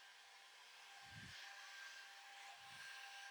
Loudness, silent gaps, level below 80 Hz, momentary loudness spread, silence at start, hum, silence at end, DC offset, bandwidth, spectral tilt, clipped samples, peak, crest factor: -56 LUFS; none; -88 dBFS; 7 LU; 0 s; none; 0 s; under 0.1%; over 20 kHz; -1 dB/octave; under 0.1%; -44 dBFS; 14 dB